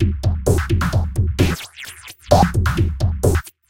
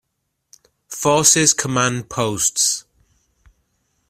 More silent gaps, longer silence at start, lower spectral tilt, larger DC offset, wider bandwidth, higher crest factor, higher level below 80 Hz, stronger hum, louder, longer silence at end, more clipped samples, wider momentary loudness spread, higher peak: neither; second, 0 s vs 0.9 s; first, -6 dB/octave vs -2.5 dB/octave; neither; about the same, 16.5 kHz vs 16 kHz; about the same, 18 dB vs 20 dB; first, -26 dBFS vs -54 dBFS; neither; second, -19 LUFS vs -16 LUFS; second, 0.2 s vs 1.3 s; neither; first, 16 LU vs 11 LU; about the same, 0 dBFS vs 0 dBFS